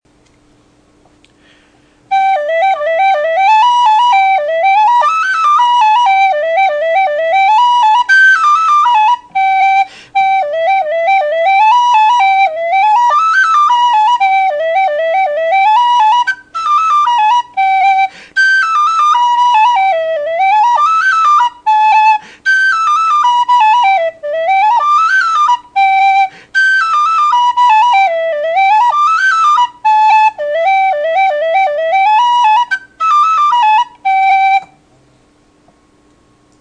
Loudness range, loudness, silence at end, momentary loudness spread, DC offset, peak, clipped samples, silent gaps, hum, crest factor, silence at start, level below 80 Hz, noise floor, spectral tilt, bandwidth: 2 LU; -10 LUFS; 1.95 s; 5 LU; under 0.1%; 0 dBFS; under 0.1%; none; none; 10 dB; 2.1 s; -60 dBFS; -50 dBFS; 0.5 dB/octave; 9.8 kHz